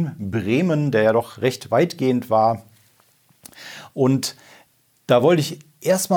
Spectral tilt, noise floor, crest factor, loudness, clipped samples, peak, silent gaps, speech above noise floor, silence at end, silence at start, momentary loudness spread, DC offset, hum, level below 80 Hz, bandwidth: -5.5 dB/octave; -58 dBFS; 18 dB; -20 LUFS; under 0.1%; -4 dBFS; none; 39 dB; 0 s; 0 s; 14 LU; under 0.1%; none; -66 dBFS; over 20 kHz